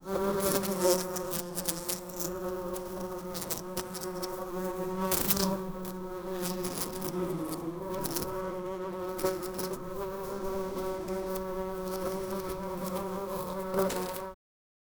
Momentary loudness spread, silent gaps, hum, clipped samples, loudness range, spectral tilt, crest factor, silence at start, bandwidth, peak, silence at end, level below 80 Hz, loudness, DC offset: 9 LU; none; none; under 0.1%; 3 LU; -4 dB/octave; 28 dB; 0 s; over 20 kHz; -6 dBFS; 0.65 s; -52 dBFS; -33 LUFS; under 0.1%